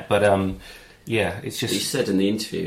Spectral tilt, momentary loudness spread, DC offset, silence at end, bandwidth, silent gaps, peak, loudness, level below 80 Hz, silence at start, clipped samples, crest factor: -4.5 dB/octave; 17 LU; under 0.1%; 0 s; 16 kHz; none; -4 dBFS; -23 LUFS; -50 dBFS; 0 s; under 0.1%; 18 dB